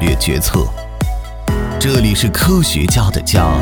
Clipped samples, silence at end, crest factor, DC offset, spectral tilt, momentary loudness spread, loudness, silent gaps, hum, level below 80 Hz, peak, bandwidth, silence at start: under 0.1%; 0 s; 14 dB; under 0.1%; -4.5 dB/octave; 9 LU; -15 LUFS; none; none; -20 dBFS; 0 dBFS; 19.5 kHz; 0 s